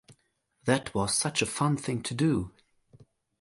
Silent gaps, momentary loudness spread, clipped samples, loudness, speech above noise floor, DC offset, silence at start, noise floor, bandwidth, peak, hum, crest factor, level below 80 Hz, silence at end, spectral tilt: none; 6 LU; under 0.1%; -28 LUFS; 45 dB; under 0.1%; 0.1 s; -73 dBFS; 11.5 kHz; -10 dBFS; none; 20 dB; -56 dBFS; 0.4 s; -4.5 dB/octave